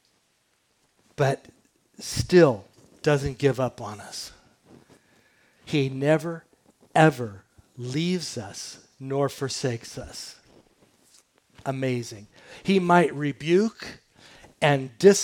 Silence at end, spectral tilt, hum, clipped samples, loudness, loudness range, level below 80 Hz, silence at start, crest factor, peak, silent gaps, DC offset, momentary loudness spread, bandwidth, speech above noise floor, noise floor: 0 s; -5.5 dB/octave; none; under 0.1%; -25 LUFS; 7 LU; -56 dBFS; 1.2 s; 22 dB; -4 dBFS; none; under 0.1%; 20 LU; 18 kHz; 45 dB; -69 dBFS